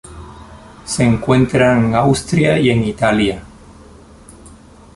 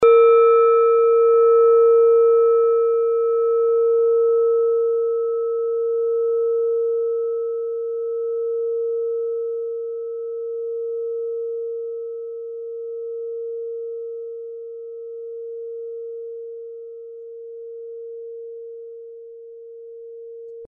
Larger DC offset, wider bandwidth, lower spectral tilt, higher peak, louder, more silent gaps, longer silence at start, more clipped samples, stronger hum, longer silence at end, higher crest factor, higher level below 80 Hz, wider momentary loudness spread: neither; first, 11.5 kHz vs 3.7 kHz; first, -6 dB/octave vs 2.5 dB/octave; about the same, -2 dBFS vs -4 dBFS; first, -14 LUFS vs -19 LUFS; neither; about the same, 0.05 s vs 0 s; neither; neither; first, 0.5 s vs 0 s; about the same, 14 dB vs 16 dB; first, -38 dBFS vs -74 dBFS; about the same, 21 LU vs 22 LU